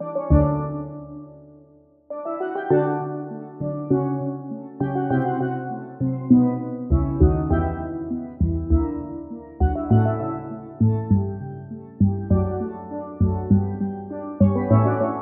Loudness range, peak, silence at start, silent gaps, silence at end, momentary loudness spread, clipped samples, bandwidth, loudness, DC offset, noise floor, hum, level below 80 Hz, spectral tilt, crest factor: 4 LU; -4 dBFS; 0 s; none; 0 s; 15 LU; under 0.1%; 3.3 kHz; -23 LUFS; under 0.1%; -53 dBFS; none; -32 dBFS; -11 dB/octave; 18 dB